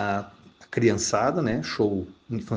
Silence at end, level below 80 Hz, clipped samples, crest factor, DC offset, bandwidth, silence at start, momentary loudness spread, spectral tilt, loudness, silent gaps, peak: 0 s; -56 dBFS; under 0.1%; 18 dB; under 0.1%; 10 kHz; 0 s; 11 LU; -5 dB/octave; -26 LUFS; none; -8 dBFS